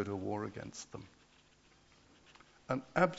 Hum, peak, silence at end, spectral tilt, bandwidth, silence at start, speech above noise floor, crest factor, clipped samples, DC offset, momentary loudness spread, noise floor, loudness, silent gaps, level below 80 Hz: none; -14 dBFS; 0 s; -5.5 dB/octave; 7.6 kHz; 0 s; 29 dB; 26 dB; under 0.1%; under 0.1%; 24 LU; -66 dBFS; -40 LUFS; none; -70 dBFS